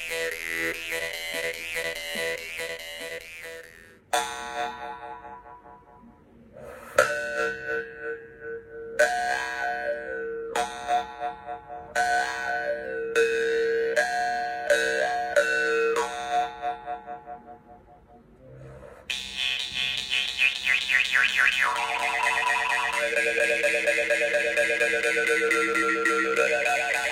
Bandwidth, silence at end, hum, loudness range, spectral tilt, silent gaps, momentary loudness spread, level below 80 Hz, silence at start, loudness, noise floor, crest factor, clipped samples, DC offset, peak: 16.5 kHz; 0 s; none; 11 LU; -1 dB/octave; none; 16 LU; -60 dBFS; 0 s; -25 LUFS; -53 dBFS; 22 dB; under 0.1%; under 0.1%; -4 dBFS